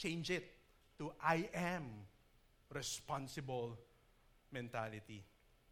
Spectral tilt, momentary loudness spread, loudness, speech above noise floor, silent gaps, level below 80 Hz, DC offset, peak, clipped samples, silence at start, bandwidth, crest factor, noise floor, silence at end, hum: -4.5 dB/octave; 19 LU; -44 LUFS; 27 dB; none; -70 dBFS; under 0.1%; -20 dBFS; under 0.1%; 0 s; 18.5 kHz; 26 dB; -71 dBFS; 0.45 s; none